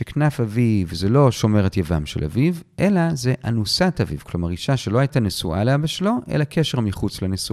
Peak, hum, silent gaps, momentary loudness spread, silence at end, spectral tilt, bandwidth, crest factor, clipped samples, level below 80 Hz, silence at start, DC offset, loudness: -2 dBFS; none; none; 7 LU; 0 s; -6 dB/octave; 14.5 kHz; 18 dB; under 0.1%; -40 dBFS; 0 s; under 0.1%; -21 LUFS